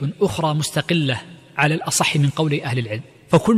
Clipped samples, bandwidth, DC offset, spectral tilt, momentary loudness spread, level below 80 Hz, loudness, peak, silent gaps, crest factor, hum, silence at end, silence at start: under 0.1%; 14.5 kHz; under 0.1%; -5 dB/octave; 9 LU; -52 dBFS; -20 LUFS; -2 dBFS; none; 16 dB; none; 0 s; 0 s